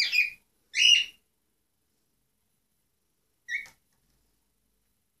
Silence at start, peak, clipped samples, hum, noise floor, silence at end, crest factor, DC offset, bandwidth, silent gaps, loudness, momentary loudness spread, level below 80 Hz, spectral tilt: 0 s; -8 dBFS; under 0.1%; none; -77 dBFS; 1.55 s; 24 dB; under 0.1%; 15 kHz; none; -22 LUFS; 16 LU; -78 dBFS; 5 dB/octave